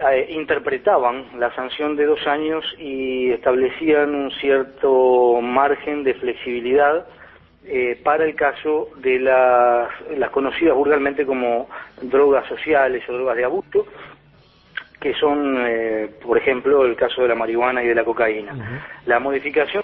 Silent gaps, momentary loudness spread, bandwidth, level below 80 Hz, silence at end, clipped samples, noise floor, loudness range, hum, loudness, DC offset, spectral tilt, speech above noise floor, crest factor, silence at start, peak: none; 9 LU; 4.4 kHz; -54 dBFS; 0 s; under 0.1%; -52 dBFS; 3 LU; none; -19 LUFS; under 0.1%; -8.5 dB/octave; 33 dB; 18 dB; 0 s; -2 dBFS